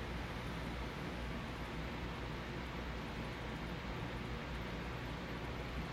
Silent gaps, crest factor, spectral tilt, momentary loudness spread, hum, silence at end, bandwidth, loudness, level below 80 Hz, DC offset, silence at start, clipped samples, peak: none; 12 dB; -6 dB/octave; 1 LU; none; 0 s; 16 kHz; -44 LUFS; -50 dBFS; under 0.1%; 0 s; under 0.1%; -30 dBFS